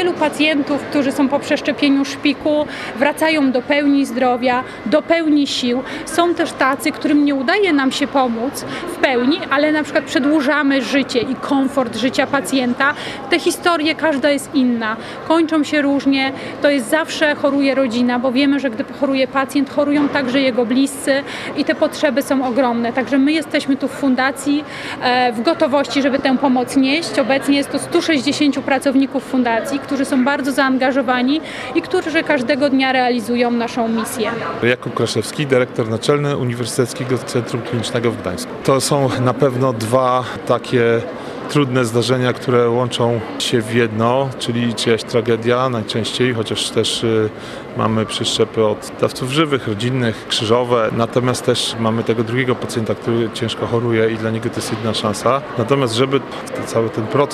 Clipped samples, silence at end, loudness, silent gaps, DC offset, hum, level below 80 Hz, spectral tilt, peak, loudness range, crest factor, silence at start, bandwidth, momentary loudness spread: under 0.1%; 0 s; -17 LUFS; none; under 0.1%; none; -54 dBFS; -5 dB/octave; -2 dBFS; 2 LU; 16 dB; 0 s; 14.5 kHz; 5 LU